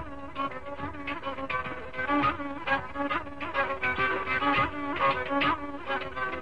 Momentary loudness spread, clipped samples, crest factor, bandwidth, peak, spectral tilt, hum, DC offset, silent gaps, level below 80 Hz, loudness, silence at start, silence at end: 9 LU; under 0.1%; 16 dB; 10 kHz; -14 dBFS; -6 dB/octave; none; 0.7%; none; -52 dBFS; -30 LUFS; 0 s; 0 s